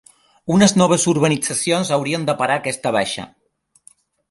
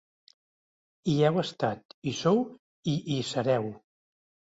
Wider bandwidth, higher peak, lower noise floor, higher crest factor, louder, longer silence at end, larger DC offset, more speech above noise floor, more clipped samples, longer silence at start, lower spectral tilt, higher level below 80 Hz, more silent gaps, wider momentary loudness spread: first, 11.5 kHz vs 8 kHz; first, 0 dBFS vs -12 dBFS; second, -62 dBFS vs under -90 dBFS; about the same, 18 dB vs 18 dB; first, -17 LUFS vs -29 LUFS; first, 1.05 s vs 0.8 s; neither; second, 44 dB vs over 62 dB; neither; second, 0.45 s vs 1.05 s; second, -4.5 dB/octave vs -6 dB/octave; first, -56 dBFS vs -66 dBFS; second, none vs 1.85-2.02 s, 2.59-2.83 s; about the same, 11 LU vs 11 LU